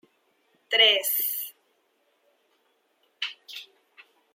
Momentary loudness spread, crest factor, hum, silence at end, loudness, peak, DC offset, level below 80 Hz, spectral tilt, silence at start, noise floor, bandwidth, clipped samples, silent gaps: 23 LU; 24 dB; none; 0.7 s; -23 LUFS; -6 dBFS; under 0.1%; under -90 dBFS; 3 dB/octave; 0.7 s; -70 dBFS; 16.5 kHz; under 0.1%; none